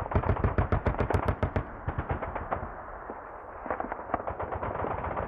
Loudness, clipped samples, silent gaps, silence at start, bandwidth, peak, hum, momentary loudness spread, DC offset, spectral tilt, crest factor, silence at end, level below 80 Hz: -32 LUFS; under 0.1%; none; 0 s; 5.6 kHz; -12 dBFS; none; 13 LU; under 0.1%; -9 dB/octave; 18 dB; 0 s; -38 dBFS